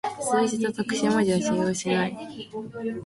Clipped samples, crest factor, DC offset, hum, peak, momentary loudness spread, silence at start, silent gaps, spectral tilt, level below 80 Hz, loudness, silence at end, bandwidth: under 0.1%; 16 dB; under 0.1%; none; -10 dBFS; 14 LU; 0.05 s; none; -5 dB/octave; -62 dBFS; -25 LUFS; 0 s; 11.5 kHz